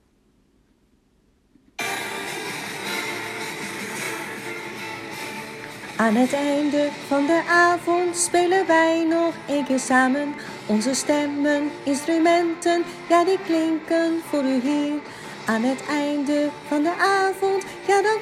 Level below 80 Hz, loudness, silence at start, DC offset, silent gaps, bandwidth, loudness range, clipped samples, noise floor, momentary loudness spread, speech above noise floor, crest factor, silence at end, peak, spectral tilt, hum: -64 dBFS; -22 LUFS; 1.8 s; under 0.1%; none; 14.5 kHz; 10 LU; under 0.1%; -62 dBFS; 13 LU; 41 dB; 18 dB; 0 s; -6 dBFS; -3.5 dB/octave; none